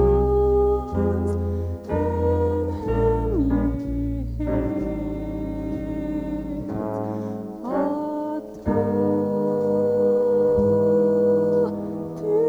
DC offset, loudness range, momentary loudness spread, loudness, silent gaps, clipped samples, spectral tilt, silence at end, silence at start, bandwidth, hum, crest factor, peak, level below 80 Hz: under 0.1%; 7 LU; 10 LU; -23 LUFS; none; under 0.1%; -10 dB/octave; 0 s; 0 s; 7.6 kHz; none; 14 dB; -8 dBFS; -34 dBFS